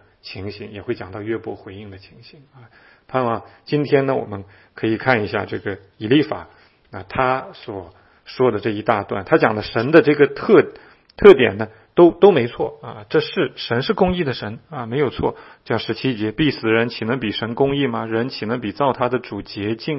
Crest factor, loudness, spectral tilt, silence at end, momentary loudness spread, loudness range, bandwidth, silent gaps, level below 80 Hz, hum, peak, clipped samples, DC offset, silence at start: 20 dB; -19 LUFS; -8.5 dB/octave; 0 s; 18 LU; 9 LU; 5.8 kHz; none; -48 dBFS; none; 0 dBFS; under 0.1%; under 0.1%; 0.25 s